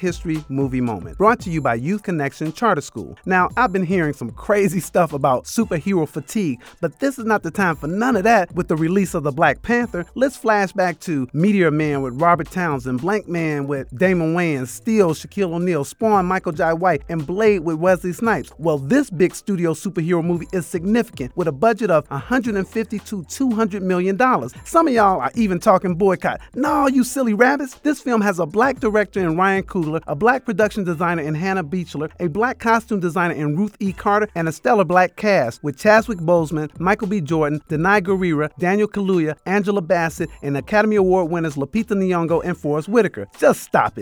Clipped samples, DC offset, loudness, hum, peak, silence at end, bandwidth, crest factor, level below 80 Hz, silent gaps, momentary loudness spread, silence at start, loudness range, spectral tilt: under 0.1%; under 0.1%; -19 LUFS; none; 0 dBFS; 0 s; over 20 kHz; 18 dB; -46 dBFS; none; 7 LU; 0 s; 3 LU; -6.5 dB/octave